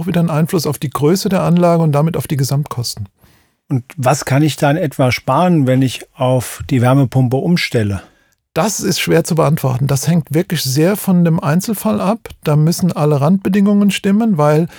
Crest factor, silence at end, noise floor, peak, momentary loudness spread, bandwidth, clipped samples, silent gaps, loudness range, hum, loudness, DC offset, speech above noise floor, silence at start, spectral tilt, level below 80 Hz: 14 dB; 0 s; -52 dBFS; 0 dBFS; 7 LU; over 20 kHz; under 0.1%; none; 2 LU; none; -14 LUFS; under 0.1%; 38 dB; 0 s; -6 dB/octave; -48 dBFS